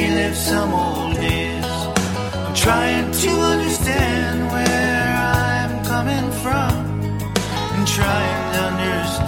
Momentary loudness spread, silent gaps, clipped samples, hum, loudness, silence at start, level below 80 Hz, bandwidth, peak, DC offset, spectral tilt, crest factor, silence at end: 5 LU; none; under 0.1%; none; -19 LUFS; 0 s; -32 dBFS; 19.5 kHz; 0 dBFS; under 0.1%; -4.5 dB/octave; 18 dB; 0 s